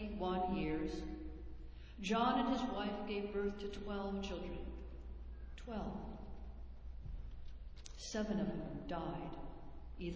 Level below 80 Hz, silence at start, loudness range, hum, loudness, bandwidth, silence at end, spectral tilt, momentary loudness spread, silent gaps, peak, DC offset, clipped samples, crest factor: -52 dBFS; 0 s; 10 LU; none; -42 LUFS; 8 kHz; 0 s; -6 dB/octave; 17 LU; none; -22 dBFS; under 0.1%; under 0.1%; 20 dB